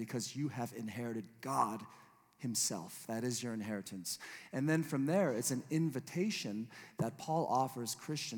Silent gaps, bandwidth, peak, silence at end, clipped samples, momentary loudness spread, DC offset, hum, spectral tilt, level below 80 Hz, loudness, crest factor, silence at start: none; 19 kHz; -18 dBFS; 0 s; under 0.1%; 10 LU; under 0.1%; none; -4.5 dB/octave; -86 dBFS; -38 LUFS; 20 dB; 0 s